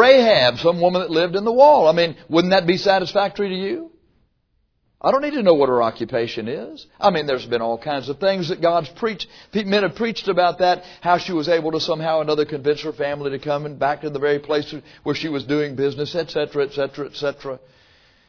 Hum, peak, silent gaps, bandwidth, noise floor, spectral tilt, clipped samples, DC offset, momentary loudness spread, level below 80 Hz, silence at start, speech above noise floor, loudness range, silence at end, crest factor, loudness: none; 0 dBFS; none; 5.4 kHz; -67 dBFS; -6 dB/octave; under 0.1%; under 0.1%; 11 LU; -56 dBFS; 0 s; 47 dB; 6 LU; 0.7 s; 20 dB; -19 LUFS